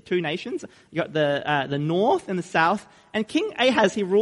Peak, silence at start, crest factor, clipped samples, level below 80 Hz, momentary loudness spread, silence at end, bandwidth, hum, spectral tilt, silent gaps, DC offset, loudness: -6 dBFS; 0.05 s; 16 dB; under 0.1%; -64 dBFS; 10 LU; 0 s; 11.5 kHz; none; -5.5 dB/octave; none; under 0.1%; -24 LUFS